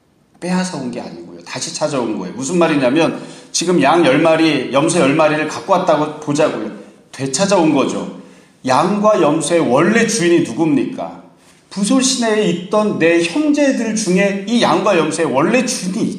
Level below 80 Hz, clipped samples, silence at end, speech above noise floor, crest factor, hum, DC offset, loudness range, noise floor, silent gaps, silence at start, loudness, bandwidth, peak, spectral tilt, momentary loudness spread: -60 dBFS; under 0.1%; 0 s; 28 dB; 16 dB; none; under 0.1%; 3 LU; -43 dBFS; none; 0.4 s; -15 LUFS; 13 kHz; 0 dBFS; -4.5 dB/octave; 13 LU